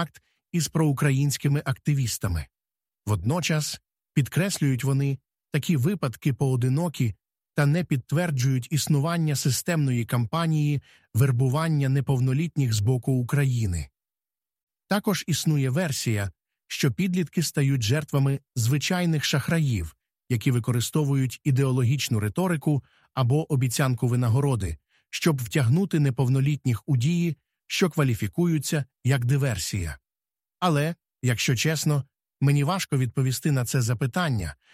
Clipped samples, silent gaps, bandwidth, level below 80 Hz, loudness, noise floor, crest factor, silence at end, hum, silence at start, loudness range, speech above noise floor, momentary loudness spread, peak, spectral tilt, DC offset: under 0.1%; 14.63-14.67 s; 16 kHz; -50 dBFS; -25 LUFS; under -90 dBFS; 16 dB; 0.2 s; none; 0 s; 2 LU; over 66 dB; 7 LU; -8 dBFS; -5.5 dB/octave; under 0.1%